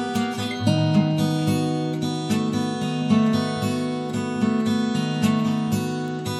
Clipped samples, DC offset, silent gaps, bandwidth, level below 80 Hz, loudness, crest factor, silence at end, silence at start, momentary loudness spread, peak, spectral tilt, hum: under 0.1%; under 0.1%; none; 13.5 kHz; -64 dBFS; -23 LUFS; 16 dB; 0 s; 0 s; 6 LU; -6 dBFS; -6 dB/octave; none